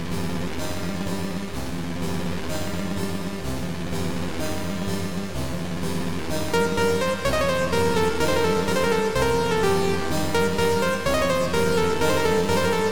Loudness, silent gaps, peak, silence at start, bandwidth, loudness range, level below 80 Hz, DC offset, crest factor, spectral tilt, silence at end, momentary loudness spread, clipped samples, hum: -24 LUFS; none; -10 dBFS; 0 s; 19 kHz; 7 LU; -40 dBFS; 3%; 14 dB; -5 dB/octave; 0 s; 8 LU; under 0.1%; none